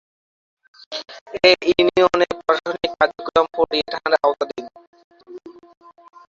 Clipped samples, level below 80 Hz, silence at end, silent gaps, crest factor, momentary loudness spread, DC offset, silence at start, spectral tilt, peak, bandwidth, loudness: under 0.1%; -54 dBFS; 0.8 s; 1.21-1.26 s, 4.87-4.93 s, 5.04-5.11 s; 20 dB; 18 LU; under 0.1%; 0.9 s; -4 dB/octave; -2 dBFS; 7.6 kHz; -18 LUFS